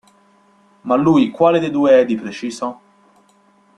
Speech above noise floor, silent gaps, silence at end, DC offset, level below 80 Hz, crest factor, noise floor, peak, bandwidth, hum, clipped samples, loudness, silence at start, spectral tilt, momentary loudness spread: 39 dB; none; 1.05 s; under 0.1%; -58 dBFS; 16 dB; -54 dBFS; -2 dBFS; 10.5 kHz; none; under 0.1%; -16 LUFS; 0.85 s; -6.5 dB/octave; 14 LU